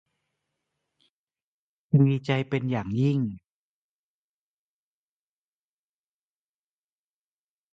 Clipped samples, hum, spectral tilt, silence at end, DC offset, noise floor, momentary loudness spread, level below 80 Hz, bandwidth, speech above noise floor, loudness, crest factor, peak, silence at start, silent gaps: under 0.1%; none; -9 dB/octave; 4.35 s; under 0.1%; under -90 dBFS; 9 LU; -64 dBFS; 7.2 kHz; over 66 dB; -25 LUFS; 22 dB; -10 dBFS; 1.95 s; none